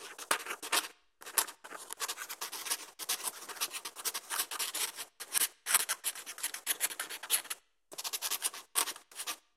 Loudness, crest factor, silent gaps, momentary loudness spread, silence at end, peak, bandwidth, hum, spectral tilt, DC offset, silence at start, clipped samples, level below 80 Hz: -34 LUFS; 32 dB; none; 10 LU; 0.15 s; -6 dBFS; 16 kHz; none; 2.5 dB/octave; under 0.1%; 0 s; under 0.1%; -88 dBFS